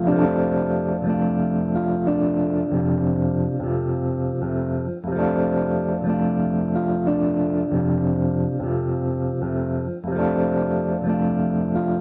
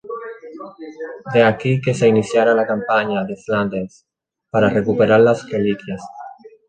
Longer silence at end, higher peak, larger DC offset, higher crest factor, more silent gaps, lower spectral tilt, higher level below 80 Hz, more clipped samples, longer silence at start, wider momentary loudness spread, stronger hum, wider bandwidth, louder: second, 0 s vs 0.2 s; second, -6 dBFS vs -2 dBFS; neither; about the same, 14 dB vs 16 dB; neither; first, -13.5 dB/octave vs -6.5 dB/octave; first, -46 dBFS vs -54 dBFS; neither; about the same, 0 s vs 0.05 s; second, 4 LU vs 20 LU; neither; second, 3 kHz vs 9.2 kHz; second, -22 LUFS vs -17 LUFS